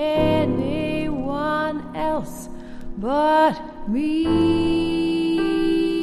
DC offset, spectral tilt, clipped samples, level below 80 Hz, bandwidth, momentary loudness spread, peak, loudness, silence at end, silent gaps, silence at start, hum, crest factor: under 0.1%; -6.5 dB/octave; under 0.1%; -42 dBFS; 13 kHz; 12 LU; -6 dBFS; -21 LUFS; 0 s; none; 0 s; none; 14 dB